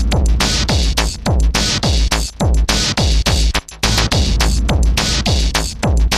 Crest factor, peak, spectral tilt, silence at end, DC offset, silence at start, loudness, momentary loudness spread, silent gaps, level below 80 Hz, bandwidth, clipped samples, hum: 14 dB; 0 dBFS; -3.5 dB/octave; 0 s; under 0.1%; 0 s; -15 LUFS; 3 LU; none; -16 dBFS; 14.5 kHz; under 0.1%; none